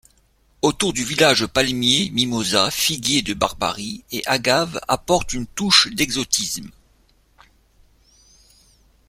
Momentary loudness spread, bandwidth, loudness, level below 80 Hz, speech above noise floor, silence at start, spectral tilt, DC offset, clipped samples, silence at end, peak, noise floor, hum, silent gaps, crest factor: 10 LU; 16.5 kHz; -19 LUFS; -46 dBFS; 39 dB; 0.65 s; -2.5 dB/octave; under 0.1%; under 0.1%; 2.4 s; 0 dBFS; -59 dBFS; none; none; 22 dB